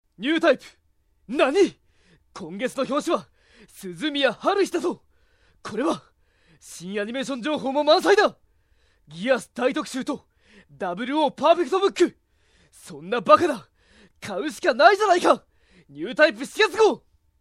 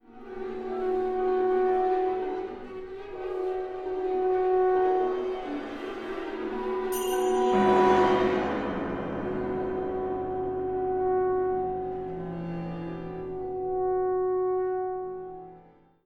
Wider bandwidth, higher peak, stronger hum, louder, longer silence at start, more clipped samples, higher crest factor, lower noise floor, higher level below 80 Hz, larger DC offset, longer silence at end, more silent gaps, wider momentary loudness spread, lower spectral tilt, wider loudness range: second, 15 kHz vs 17 kHz; first, 0 dBFS vs -10 dBFS; neither; first, -22 LUFS vs -28 LUFS; about the same, 0.2 s vs 0.1 s; neither; first, 24 dB vs 18 dB; first, -62 dBFS vs -55 dBFS; second, -64 dBFS vs -52 dBFS; neither; about the same, 0.45 s vs 0.45 s; neither; first, 17 LU vs 13 LU; second, -4 dB/octave vs -6 dB/octave; about the same, 6 LU vs 5 LU